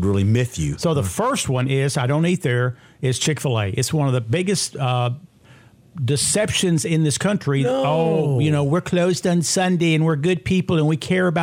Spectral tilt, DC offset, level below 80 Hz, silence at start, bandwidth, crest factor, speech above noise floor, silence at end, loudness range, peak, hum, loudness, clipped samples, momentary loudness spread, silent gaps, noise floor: -5 dB/octave; under 0.1%; -50 dBFS; 0 s; 16 kHz; 12 dB; 30 dB; 0 s; 3 LU; -6 dBFS; none; -20 LUFS; under 0.1%; 4 LU; none; -49 dBFS